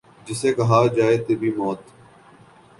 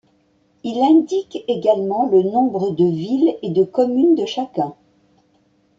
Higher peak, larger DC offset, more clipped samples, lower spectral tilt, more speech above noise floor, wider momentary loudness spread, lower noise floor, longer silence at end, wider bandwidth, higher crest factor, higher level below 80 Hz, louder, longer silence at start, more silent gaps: about the same, -4 dBFS vs -4 dBFS; neither; neither; about the same, -6.5 dB/octave vs -7.5 dB/octave; second, 30 dB vs 43 dB; first, 12 LU vs 9 LU; second, -50 dBFS vs -60 dBFS; about the same, 0.95 s vs 1.05 s; first, 11.5 kHz vs 7.6 kHz; about the same, 18 dB vs 16 dB; first, -58 dBFS vs -64 dBFS; about the same, -20 LUFS vs -18 LUFS; second, 0.25 s vs 0.65 s; neither